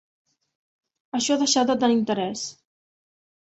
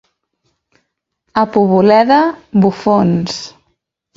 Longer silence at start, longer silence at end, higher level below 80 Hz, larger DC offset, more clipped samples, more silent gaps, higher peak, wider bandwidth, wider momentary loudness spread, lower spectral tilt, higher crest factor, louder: second, 1.15 s vs 1.35 s; first, 0.9 s vs 0.65 s; second, -68 dBFS vs -52 dBFS; neither; neither; neither; second, -8 dBFS vs 0 dBFS; about the same, 8.2 kHz vs 7.8 kHz; about the same, 12 LU vs 12 LU; second, -3 dB/octave vs -7 dB/octave; about the same, 18 dB vs 14 dB; second, -23 LUFS vs -12 LUFS